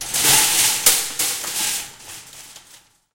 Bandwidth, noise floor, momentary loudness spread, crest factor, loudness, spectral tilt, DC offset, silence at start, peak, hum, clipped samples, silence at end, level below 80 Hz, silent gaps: 17 kHz; -50 dBFS; 23 LU; 22 dB; -16 LUFS; 1 dB/octave; under 0.1%; 0 s; 0 dBFS; none; under 0.1%; 0.55 s; -54 dBFS; none